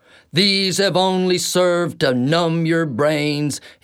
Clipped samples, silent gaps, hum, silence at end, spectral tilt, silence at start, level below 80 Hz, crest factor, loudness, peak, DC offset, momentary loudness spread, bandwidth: under 0.1%; none; none; 0.15 s; -4.5 dB/octave; 0.35 s; -62 dBFS; 14 dB; -18 LUFS; -4 dBFS; under 0.1%; 5 LU; 16.5 kHz